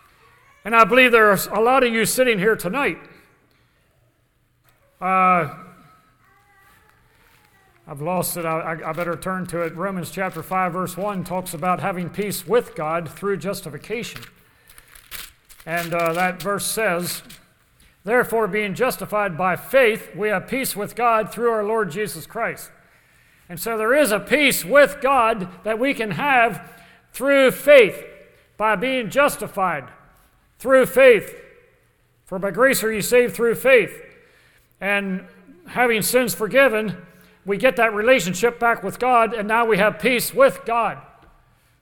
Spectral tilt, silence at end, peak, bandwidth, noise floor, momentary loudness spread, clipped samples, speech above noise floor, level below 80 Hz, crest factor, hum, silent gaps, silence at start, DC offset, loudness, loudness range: -4 dB/octave; 0.8 s; 0 dBFS; 19 kHz; -64 dBFS; 14 LU; under 0.1%; 44 dB; -52 dBFS; 20 dB; none; none; 0.65 s; under 0.1%; -19 LUFS; 8 LU